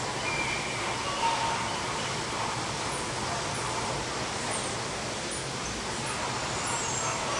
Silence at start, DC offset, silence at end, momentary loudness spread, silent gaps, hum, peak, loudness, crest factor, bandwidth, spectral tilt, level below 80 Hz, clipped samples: 0 s; under 0.1%; 0 s; 4 LU; none; none; -16 dBFS; -30 LUFS; 16 dB; 11.5 kHz; -2.5 dB/octave; -52 dBFS; under 0.1%